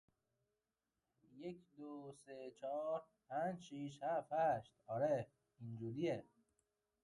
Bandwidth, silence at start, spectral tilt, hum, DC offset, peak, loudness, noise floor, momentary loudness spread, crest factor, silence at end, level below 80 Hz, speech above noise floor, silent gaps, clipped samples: 11 kHz; 1.3 s; -7 dB/octave; none; under 0.1%; -28 dBFS; -44 LUFS; under -90 dBFS; 16 LU; 18 dB; 0.8 s; -82 dBFS; over 46 dB; none; under 0.1%